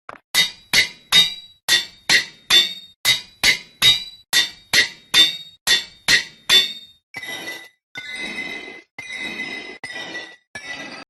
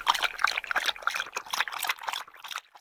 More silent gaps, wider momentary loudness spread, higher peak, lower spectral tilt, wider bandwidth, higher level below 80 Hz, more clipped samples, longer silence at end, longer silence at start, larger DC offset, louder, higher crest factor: first, 1.63-1.68 s, 2.96-3.04 s, 5.61-5.66 s, 7.03-7.14 s, 7.83-7.95 s, 8.91-8.98 s, 10.47-10.54 s vs none; first, 19 LU vs 11 LU; first, -2 dBFS vs -6 dBFS; first, 0.5 dB/octave vs 2 dB/octave; second, 13.5 kHz vs 18 kHz; first, -54 dBFS vs -66 dBFS; neither; about the same, 0.05 s vs 0 s; first, 0.35 s vs 0 s; neither; first, -17 LUFS vs -30 LUFS; second, 20 dB vs 26 dB